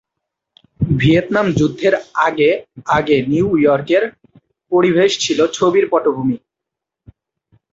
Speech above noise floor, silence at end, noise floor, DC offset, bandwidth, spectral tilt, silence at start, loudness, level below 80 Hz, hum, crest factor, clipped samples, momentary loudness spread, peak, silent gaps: 68 dB; 1.35 s; -83 dBFS; under 0.1%; 8 kHz; -5.5 dB/octave; 0.8 s; -15 LUFS; -44 dBFS; none; 16 dB; under 0.1%; 7 LU; 0 dBFS; none